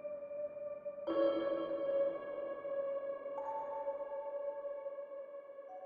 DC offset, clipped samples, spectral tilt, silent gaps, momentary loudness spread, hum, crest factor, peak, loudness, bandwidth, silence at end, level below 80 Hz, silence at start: under 0.1%; under 0.1%; -3.5 dB/octave; none; 12 LU; none; 18 dB; -22 dBFS; -40 LUFS; 5 kHz; 0 s; -80 dBFS; 0 s